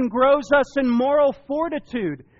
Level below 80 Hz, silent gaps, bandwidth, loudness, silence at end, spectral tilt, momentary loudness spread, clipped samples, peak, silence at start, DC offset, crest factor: -50 dBFS; none; 7.6 kHz; -20 LUFS; 0.2 s; -4 dB/octave; 9 LU; under 0.1%; -6 dBFS; 0 s; under 0.1%; 14 dB